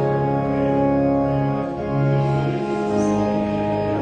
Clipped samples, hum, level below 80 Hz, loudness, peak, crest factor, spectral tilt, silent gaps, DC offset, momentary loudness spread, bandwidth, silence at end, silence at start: under 0.1%; none; -42 dBFS; -21 LUFS; -8 dBFS; 12 dB; -8.5 dB/octave; none; under 0.1%; 4 LU; 9 kHz; 0 s; 0 s